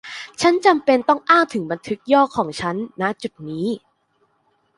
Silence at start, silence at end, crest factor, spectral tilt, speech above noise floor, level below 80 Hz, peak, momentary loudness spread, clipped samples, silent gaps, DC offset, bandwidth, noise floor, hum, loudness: 0.05 s; 1 s; 18 dB; -5 dB/octave; 46 dB; -60 dBFS; -2 dBFS; 13 LU; under 0.1%; none; under 0.1%; 11.5 kHz; -65 dBFS; none; -19 LUFS